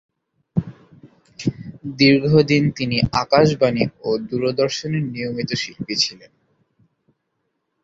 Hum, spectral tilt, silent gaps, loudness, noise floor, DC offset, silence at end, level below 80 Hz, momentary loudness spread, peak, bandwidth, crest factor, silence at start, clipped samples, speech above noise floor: none; -5.5 dB/octave; none; -19 LUFS; -73 dBFS; under 0.1%; 1.7 s; -50 dBFS; 12 LU; -2 dBFS; 7.8 kHz; 20 dB; 0.55 s; under 0.1%; 55 dB